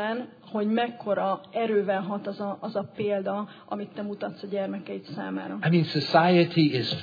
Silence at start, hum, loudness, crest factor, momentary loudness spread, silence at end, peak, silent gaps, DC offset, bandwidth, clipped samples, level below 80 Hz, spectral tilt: 0 s; none; -27 LUFS; 20 dB; 14 LU; 0 s; -6 dBFS; none; under 0.1%; 5 kHz; under 0.1%; -76 dBFS; -8 dB/octave